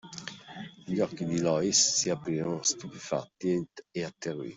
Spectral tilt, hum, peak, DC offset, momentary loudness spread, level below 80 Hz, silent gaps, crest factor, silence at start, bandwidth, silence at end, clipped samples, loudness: -3 dB/octave; none; -12 dBFS; under 0.1%; 19 LU; -68 dBFS; none; 20 dB; 0.05 s; 8.2 kHz; 0 s; under 0.1%; -29 LUFS